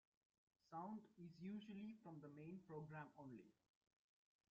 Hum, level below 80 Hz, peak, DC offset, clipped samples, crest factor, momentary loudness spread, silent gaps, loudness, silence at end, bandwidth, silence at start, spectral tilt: none; under -90 dBFS; -42 dBFS; under 0.1%; under 0.1%; 16 dB; 7 LU; none; -58 LUFS; 1 s; 7.2 kHz; 0.65 s; -6.5 dB/octave